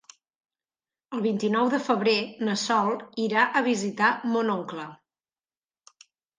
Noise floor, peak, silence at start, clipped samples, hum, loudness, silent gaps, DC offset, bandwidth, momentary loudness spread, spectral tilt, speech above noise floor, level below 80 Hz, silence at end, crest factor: under -90 dBFS; -8 dBFS; 1.1 s; under 0.1%; none; -25 LUFS; none; under 0.1%; 10 kHz; 9 LU; -4.5 dB/octave; over 65 dB; -78 dBFS; 1.45 s; 18 dB